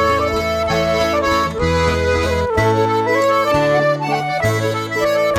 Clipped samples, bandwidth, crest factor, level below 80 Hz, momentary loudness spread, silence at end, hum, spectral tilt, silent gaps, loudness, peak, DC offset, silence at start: under 0.1%; 17 kHz; 14 dB; -32 dBFS; 4 LU; 0 s; none; -5.5 dB/octave; none; -16 LUFS; -2 dBFS; under 0.1%; 0 s